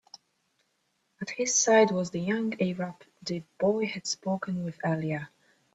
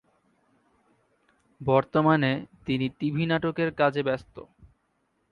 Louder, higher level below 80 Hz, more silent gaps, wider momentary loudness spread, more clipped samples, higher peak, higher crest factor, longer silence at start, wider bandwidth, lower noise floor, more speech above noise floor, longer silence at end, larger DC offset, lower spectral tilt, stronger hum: about the same, -28 LUFS vs -26 LUFS; second, -70 dBFS vs -60 dBFS; neither; first, 16 LU vs 11 LU; neither; about the same, -8 dBFS vs -8 dBFS; about the same, 20 dB vs 20 dB; second, 0.15 s vs 1.6 s; first, 8.4 kHz vs 6.4 kHz; about the same, -75 dBFS vs -73 dBFS; about the same, 47 dB vs 47 dB; second, 0.45 s vs 0.85 s; neither; second, -4 dB/octave vs -8.5 dB/octave; neither